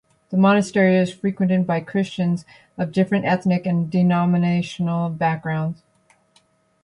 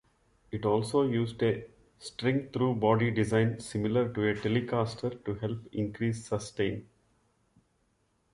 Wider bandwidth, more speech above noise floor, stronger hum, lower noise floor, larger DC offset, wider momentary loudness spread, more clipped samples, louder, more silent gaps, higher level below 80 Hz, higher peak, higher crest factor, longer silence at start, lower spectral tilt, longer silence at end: about the same, 10.5 kHz vs 11.5 kHz; about the same, 41 dB vs 43 dB; neither; second, -60 dBFS vs -73 dBFS; neither; about the same, 9 LU vs 9 LU; neither; first, -20 LUFS vs -30 LUFS; neither; about the same, -60 dBFS vs -58 dBFS; first, -4 dBFS vs -12 dBFS; about the same, 16 dB vs 20 dB; second, 0.3 s vs 0.5 s; about the same, -7.5 dB/octave vs -6.5 dB/octave; second, 1.1 s vs 1.5 s